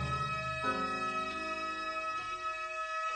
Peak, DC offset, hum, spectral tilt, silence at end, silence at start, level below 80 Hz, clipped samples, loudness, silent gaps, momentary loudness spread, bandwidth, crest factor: -20 dBFS; under 0.1%; none; -4 dB/octave; 0 s; 0 s; -56 dBFS; under 0.1%; -35 LUFS; none; 3 LU; 10 kHz; 16 dB